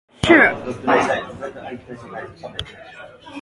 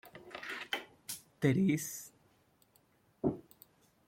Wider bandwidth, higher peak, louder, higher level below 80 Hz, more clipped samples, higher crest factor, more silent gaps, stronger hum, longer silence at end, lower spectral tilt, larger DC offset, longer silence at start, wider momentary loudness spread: second, 11.5 kHz vs 16.5 kHz; first, 0 dBFS vs -16 dBFS; first, -16 LUFS vs -36 LUFS; first, -48 dBFS vs -70 dBFS; neither; about the same, 20 dB vs 22 dB; neither; neither; second, 0 s vs 0.65 s; about the same, -5 dB/octave vs -5.5 dB/octave; neither; first, 0.25 s vs 0.05 s; first, 25 LU vs 17 LU